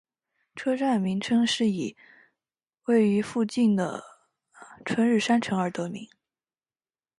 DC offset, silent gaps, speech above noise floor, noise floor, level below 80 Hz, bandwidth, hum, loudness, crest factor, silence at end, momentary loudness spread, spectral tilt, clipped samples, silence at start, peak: under 0.1%; none; over 65 dB; under -90 dBFS; -70 dBFS; 11.5 kHz; none; -26 LUFS; 16 dB; 1.15 s; 14 LU; -5.5 dB/octave; under 0.1%; 0.55 s; -10 dBFS